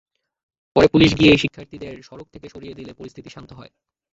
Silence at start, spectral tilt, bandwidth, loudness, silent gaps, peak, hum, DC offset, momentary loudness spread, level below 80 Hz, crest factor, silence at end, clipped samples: 0.75 s; -6 dB/octave; 7.8 kHz; -15 LUFS; none; -2 dBFS; none; under 0.1%; 26 LU; -44 dBFS; 20 dB; 0.7 s; under 0.1%